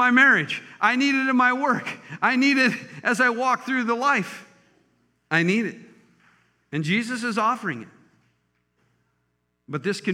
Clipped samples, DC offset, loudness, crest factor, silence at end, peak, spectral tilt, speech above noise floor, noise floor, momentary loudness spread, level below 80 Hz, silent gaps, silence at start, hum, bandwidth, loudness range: under 0.1%; under 0.1%; -22 LUFS; 18 dB; 0 s; -4 dBFS; -4.5 dB/octave; 51 dB; -73 dBFS; 13 LU; -80 dBFS; none; 0 s; none; 13.5 kHz; 8 LU